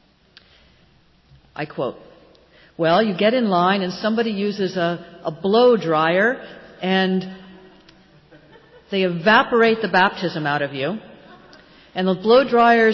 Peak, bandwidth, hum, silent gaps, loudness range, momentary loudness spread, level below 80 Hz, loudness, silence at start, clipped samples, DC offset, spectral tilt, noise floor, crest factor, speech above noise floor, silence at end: -4 dBFS; 6.8 kHz; none; none; 4 LU; 14 LU; -60 dBFS; -19 LUFS; 1.6 s; under 0.1%; under 0.1%; -6.5 dB/octave; -55 dBFS; 16 dB; 37 dB; 0 s